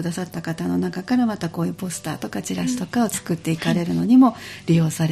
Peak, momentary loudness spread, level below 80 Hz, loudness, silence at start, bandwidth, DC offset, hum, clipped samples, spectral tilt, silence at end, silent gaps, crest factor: -4 dBFS; 13 LU; -56 dBFS; -22 LUFS; 0 s; 14.5 kHz; under 0.1%; none; under 0.1%; -6 dB/octave; 0 s; none; 16 dB